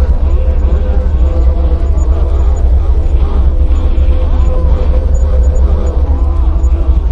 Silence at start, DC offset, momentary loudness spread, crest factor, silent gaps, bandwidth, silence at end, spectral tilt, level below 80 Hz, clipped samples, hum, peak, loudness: 0 s; under 0.1%; 1 LU; 8 dB; none; 7.4 kHz; 0 s; -8.5 dB/octave; -8 dBFS; under 0.1%; none; 0 dBFS; -13 LUFS